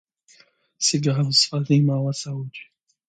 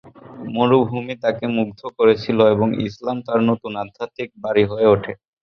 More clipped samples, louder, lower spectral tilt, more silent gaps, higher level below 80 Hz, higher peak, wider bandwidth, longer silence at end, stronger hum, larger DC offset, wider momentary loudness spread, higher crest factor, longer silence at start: neither; about the same, -21 LUFS vs -19 LUFS; second, -4.5 dB/octave vs -8 dB/octave; neither; second, -66 dBFS vs -52 dBFS; second, -6 dBFS vs -2 dBFS; first, 9.4 kHz vs 6.4 kHz; first, 0.45 s vs 0.3 s; neither; neither; about the same, 15 LU vs 13 LU; about the same, 18 dB vs 18 dB; first, 0.8 s vs 0.05 s